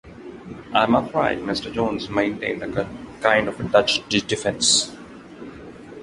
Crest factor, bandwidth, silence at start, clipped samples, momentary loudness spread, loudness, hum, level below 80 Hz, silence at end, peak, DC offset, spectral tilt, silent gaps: 22 dB; 11.5 kHz; 0.05 s; under 0.1%; 22 LU; -21 LUFS; none; -50 dBFS; 0 s; -2 dBFS; under 0.1%; -3 dB/octave; none